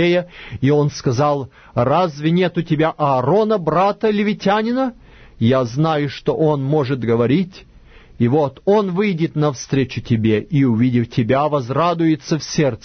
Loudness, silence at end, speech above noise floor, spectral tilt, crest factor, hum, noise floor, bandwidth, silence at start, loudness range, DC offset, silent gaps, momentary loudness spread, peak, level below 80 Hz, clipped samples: -18 LUFS; 0.05 s; 27 dB; -7 dB/octave; 12 dB; none; -44 dBFS; 6.6 kHz; 0 s; 2 LU; under 0.1%; none; 5 LU; -4 dBFS; -48 dBFS; under 0.1%